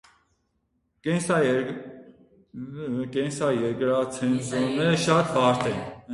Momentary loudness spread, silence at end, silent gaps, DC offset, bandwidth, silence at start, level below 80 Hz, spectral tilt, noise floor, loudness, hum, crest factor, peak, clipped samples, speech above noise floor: 15 LU; 0 s; none; under 0.1%; 11.5 kHz; 1.05 s; -60 dBFS; -5.5 dB/octave; -73 dBFS; -25 LUFS; none; 20 dB; -6 dBFS; under 0.1%; 49 dB